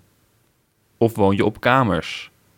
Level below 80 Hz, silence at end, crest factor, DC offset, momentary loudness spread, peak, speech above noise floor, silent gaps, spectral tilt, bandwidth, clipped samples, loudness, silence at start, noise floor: -50 dBFS; 0.3 s; 20 dB; under 0.1%; 11 LU; -2 dBFS; 45 dB; none; -6.5 dB/octave; 18 kHz; under 0.1%; -19 LUFS; 1 s; -64 dBFS